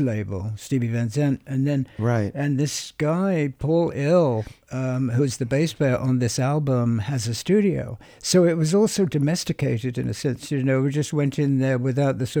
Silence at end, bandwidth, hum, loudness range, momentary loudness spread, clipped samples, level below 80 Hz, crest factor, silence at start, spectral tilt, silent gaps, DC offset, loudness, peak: 0 s; 19 kHz; none; 2 LU; 7 LU; under 0.1%; -52 dBFS; 16 dB; 0 s; -6.5 dB/octave; none; under 0.1%; -23 LUFS; -6 dBFS